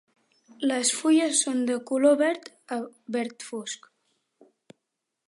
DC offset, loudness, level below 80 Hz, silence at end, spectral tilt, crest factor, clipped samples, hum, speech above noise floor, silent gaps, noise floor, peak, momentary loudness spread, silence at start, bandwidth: under 0.1%; -25 LUFS; -84 dBFS; 1.5 s; -2 dB/octave; 18 dB; under 0.1%; none; 58 dB; none; -83 dBFS; -8 dBFS; 14 LU; 0.6 s; 11.5 kHz